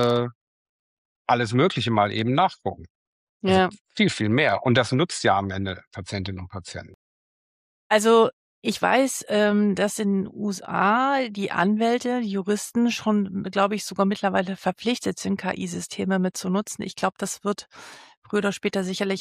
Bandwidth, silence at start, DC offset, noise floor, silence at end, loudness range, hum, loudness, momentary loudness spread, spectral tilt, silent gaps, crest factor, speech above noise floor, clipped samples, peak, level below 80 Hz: 15.5 kHz; 0 s; under 0.1%; under -90 dBFS; 0 s; 5 LU; none; -23 LUFS; 12 LU; -5 dB/octave; 0.35-1.25 s, 2.90-3.40 s, 3.81-3.85 s, 5.87-5.91 s, 6.94-7.90 s, 8.33-8.62 s, 18.17-18.22 s; 18 dB; over 67 dB; under 0.1%; -6 dBFS; -62 dBFS